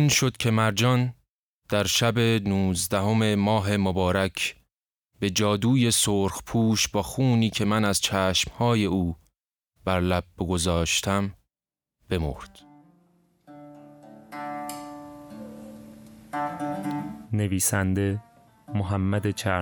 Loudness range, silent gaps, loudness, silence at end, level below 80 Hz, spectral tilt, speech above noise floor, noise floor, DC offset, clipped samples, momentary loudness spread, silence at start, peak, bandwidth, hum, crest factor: 14 LU; 1.29-1.62 s; -25 LUFS; 0 s; -48 dBFS; -4.5 dB/octave; over 66 dB; under -90 dBFS; under 0.1%; under 0.1%; 14 LU; 0 s; -8 dBFS; over 20 kHz; none; 18 dB